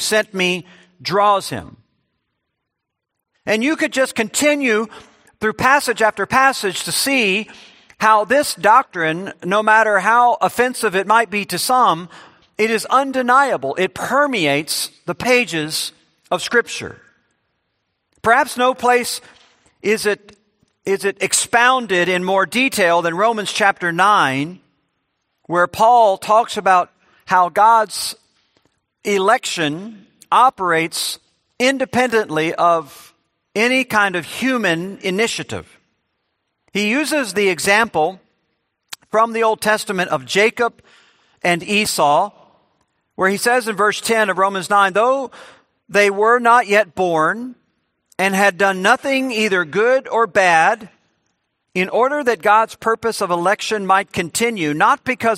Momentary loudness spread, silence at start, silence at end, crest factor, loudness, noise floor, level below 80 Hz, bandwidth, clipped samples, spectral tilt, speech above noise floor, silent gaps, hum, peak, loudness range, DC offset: 10 LU; 0 s; 0 s; 18 dB; -16 LUFS; -78 dBFS; -60 dBFS; 16 kHz; under 0.1%; -3 dB/octave; 62 dB; none; none; 0 dBFS; 5 LU; under 0.1%